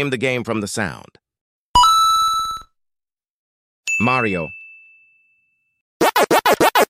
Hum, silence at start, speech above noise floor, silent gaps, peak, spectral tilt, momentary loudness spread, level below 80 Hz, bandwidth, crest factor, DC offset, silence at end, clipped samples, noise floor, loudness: none; 0 s; 63 dB; 1.41-1.74 s, 3.30-3.84 s, 5.81-6.00 s; -2 dBFS; -3 dB/octave; 17 LU; -44 dBFS; 16.5 kHz; 16 dB; under 0.1%; 0.05 s; under 0.1%; -84 dBFS; -17 LUFS